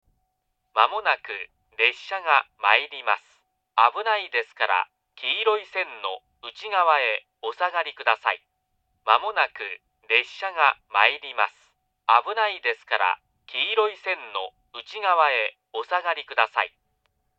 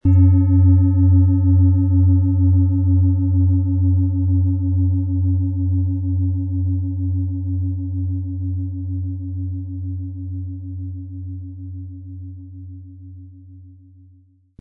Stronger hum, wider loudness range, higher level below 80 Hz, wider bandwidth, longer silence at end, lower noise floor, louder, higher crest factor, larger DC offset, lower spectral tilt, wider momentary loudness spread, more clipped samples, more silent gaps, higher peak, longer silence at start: neither; second, 2 LU vs 18 LU; second, -76 dBFS vs -46 dBFS; first, 8 kHz vs 1.3 kHz; second, 0.7 s vs 0.9 s; first, -76 dBFS vs -52 dBFS; second, -23 LUFS vs -18 LUFS; first, 24 dB vs 12 dB; neither; second, -0.5 dB/octave vs -16 dB/octave; second, 13 LU vs 19 LU; neither; neither; first, 0 dBFS vs -6 dBFS; first, 0.75 s vs 0.05 s